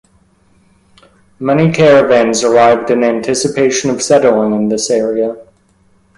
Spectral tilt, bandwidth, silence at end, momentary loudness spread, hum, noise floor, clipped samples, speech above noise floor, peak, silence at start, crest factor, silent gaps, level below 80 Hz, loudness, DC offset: -4.5 dB/octave; 11.5 kHz; 0.75 s; 8 LU; none; -52 dBFS; under 0.1%; 41 dB; 0 dBFS; 1.4 s; 12 dB; none; -50 dBFS; -11 LUFS; under 0.1%